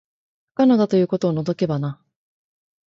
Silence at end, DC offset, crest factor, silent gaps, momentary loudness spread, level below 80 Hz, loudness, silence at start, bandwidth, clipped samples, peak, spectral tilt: 0.95 s; under 0.1%; 16 dB; none; 11 LU; -62 dBFS; -20 LUFS; 0.6 s; 7.4 kHz; under 0.1%; -6 dBFS; -8.5 dB/octave